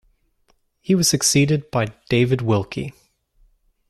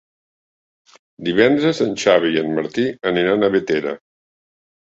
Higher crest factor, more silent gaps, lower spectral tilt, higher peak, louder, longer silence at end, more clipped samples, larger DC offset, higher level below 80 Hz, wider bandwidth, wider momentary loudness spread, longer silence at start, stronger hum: about the same, 18 dB vs 18 dB; neither; about the same, -4.5 dB/octave vs -5 dB/octave; about the same, -4 dBFS vs -2 dBFS; about the same, -19 LUFS vs -18 LUFS; about the same, 1 s vs 0.9 s; neither; neither; first, -50 dBFS vs -58 dBFS; first, 15 kHz vs 8 kHz; first, 14 LU vs 7 LU; second, 0.9 s vs 1.2 s; neither